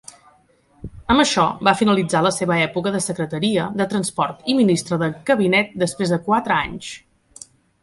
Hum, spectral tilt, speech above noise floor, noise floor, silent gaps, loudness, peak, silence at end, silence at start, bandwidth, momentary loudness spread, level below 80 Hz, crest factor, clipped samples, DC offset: none; -4.5 dB/octave; 38 dB; -57 dBFS; none; -19 LUFS; -2 dBFS; 0.85 s; 0.85 s; 11.5 kHz; 10 LU; -48 dBFS; 18 dB; under 0.1%; under 0.1%